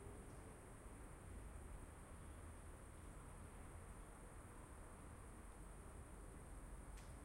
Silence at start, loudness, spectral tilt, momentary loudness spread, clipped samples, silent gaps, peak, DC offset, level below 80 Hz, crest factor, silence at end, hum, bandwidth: 0 s; -59 LUFS; -5.5 dB/octave; 2 LU; under 0.1%; none; -44 dBFS; under 0.1%; -60 dBFS; 12 dB; 0 s; none; 16 kHz